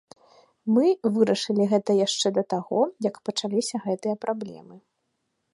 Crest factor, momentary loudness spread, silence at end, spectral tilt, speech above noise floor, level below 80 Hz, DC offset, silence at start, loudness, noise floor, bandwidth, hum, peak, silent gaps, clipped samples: 18 dB; 8 LU; 0.75 s; -5 dB/octave; 52 dB; -78 dBFS; under 0.1%; 0.65 s; -24 LUFS; -76 dBFS; 11.5 kHz; none; -6 dBFS; none; under 0.1%